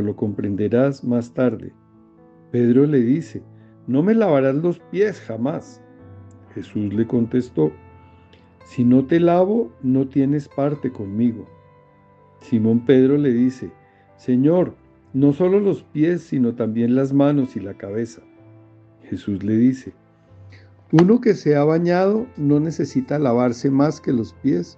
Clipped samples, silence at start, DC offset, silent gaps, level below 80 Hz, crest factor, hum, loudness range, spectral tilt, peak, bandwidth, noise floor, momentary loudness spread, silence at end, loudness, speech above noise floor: under 0.1%; 0 s; under 0.1%; none; -62 dBFS; 20 dB; none; 5 LU; -8.5 dB/octave; 0 dBFS; 7.8 kHz; -51 dBFS; 13 LU; 0.05 s; -19 LUFS; 33 dB